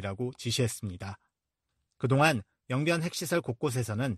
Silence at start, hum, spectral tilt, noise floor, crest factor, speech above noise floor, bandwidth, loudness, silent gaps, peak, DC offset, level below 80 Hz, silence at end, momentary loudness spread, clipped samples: 0 s; none; -5 dB/octave; -84 dBFS; 22 dB; 55 dB; 13.5 kHz; -30 LUFS; none; -10 dBFS; under 0.1%; -64 dBFS; 0 s; 14 LU; under 0.1%